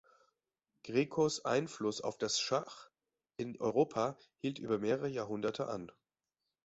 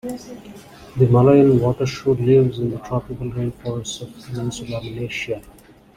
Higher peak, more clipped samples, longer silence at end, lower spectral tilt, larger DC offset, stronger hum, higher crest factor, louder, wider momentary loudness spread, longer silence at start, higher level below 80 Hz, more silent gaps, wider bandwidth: second, -18 dBFS vs -2 dBFS; neither; first, 0.8 s vs 0.45 s; second, -4 dB/octave vs -7 dB/octave; neither; neither; about the same, 20 dB vs 18 dB; second, -36 LUFS vs -19 LUFS; second, 12 LU vs 19 LU; first, 0.85 s vs 0.05 s; second, -74 dBFS vs -46 dBFS; neither; second, 8 kHz vs 14 kHz